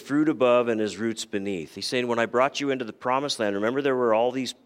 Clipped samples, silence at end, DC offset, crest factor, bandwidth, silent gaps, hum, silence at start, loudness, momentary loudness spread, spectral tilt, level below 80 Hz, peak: under 0.1%; 0.15 s; under 0.1%; 18 dB; 15.5 kHz; none; none; 0 s; -25 LUFS; 9 LU; -4.5 dB/octave; -72 dBFS; -6 dBFS